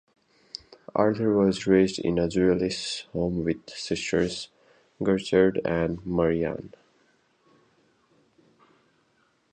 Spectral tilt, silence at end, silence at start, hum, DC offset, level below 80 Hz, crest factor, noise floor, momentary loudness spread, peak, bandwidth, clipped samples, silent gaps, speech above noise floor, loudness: -6 dB/octave; 2.85 s; 0.95 s; none; under 0.1%; -52 dBFS; 20 dB; -67 dBFS; 16 LU; -6 dBFS; 9.6 kHz; under 0.1%; none; 43 dB; -25 LUFS